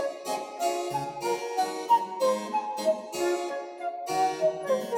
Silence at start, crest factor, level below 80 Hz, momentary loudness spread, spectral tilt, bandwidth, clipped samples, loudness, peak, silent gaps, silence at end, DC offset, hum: 0 s; 16 dB; -74 dBFS; 8 LU; -3.5 dB/octave; 18 kHz; under 0.1%; -29 LUFS; -12 dBFS; none; 0 s; under 0.1%; none